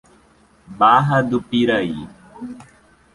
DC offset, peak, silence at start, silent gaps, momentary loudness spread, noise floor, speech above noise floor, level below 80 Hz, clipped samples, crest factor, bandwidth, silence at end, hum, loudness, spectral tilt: under 0.1%; -2 dBFS; 0.7 s; none; 22 LU; -53 dBFS; 36 dB; -52 dBFS; under 0.1%; 18 dB; 11 kHz; 0.5 s; none; -17 LUFS; -7 dB/octave